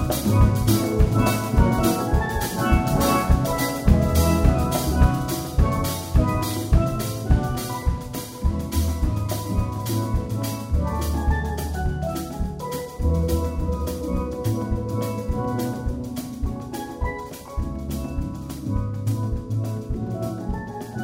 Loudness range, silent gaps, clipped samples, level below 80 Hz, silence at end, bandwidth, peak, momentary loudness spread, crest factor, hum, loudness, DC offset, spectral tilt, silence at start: 8 LU; none; under 0.1%; -26 dBFS; 0 s; 16.5 kHz; -4 dBFS; 10 LU; 18 dB; none; -24 LUFS; under 0.1%; -6 dB/octave; 0 s